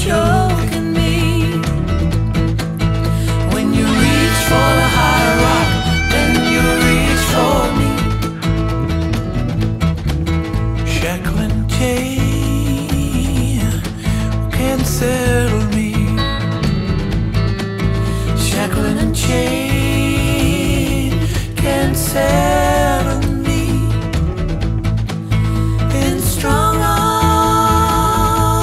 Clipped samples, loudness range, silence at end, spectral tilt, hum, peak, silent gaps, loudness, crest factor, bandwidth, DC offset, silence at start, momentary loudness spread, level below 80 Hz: under 0.1%; 4 LU; 0 s; -5.5 dB/octave; none; 0 dBFS; none; -15 LUFS; 14 dB; 16 kHz; under 0.1%; 0 s; 6 LU; -22 dBFS